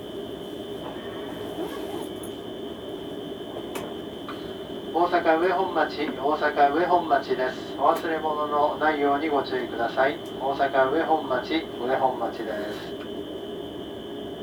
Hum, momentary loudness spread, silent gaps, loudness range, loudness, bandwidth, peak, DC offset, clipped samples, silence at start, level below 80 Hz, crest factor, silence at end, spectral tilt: none; 14 LU; none; 11 LU; -27 LUFS; over 20 kHz; -6 dBFS; under 0.1%; under 0.1%; 0 s; -58 dBFS; 20 dB; 0 s; -5.5 dB/octave